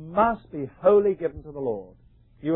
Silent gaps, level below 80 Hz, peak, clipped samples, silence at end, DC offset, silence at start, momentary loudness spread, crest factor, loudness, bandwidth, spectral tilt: none; -52 dBFS; -8 dBFS; under 0.1%; 0 s; under 0.1%; 0 s; 15 LU; 16 dB; -24 LUFS; 4 kHz; -11.5 dB/octave